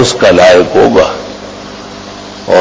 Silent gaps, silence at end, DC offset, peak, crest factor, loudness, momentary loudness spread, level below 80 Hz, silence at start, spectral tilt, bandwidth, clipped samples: none; 0 s; under 0.1%; 0 dBFS; 8 dB; -6 LUFS; 21 LU; -36 dBFS; 0 s; -4.5 dB/octave; 8 kHz; 3%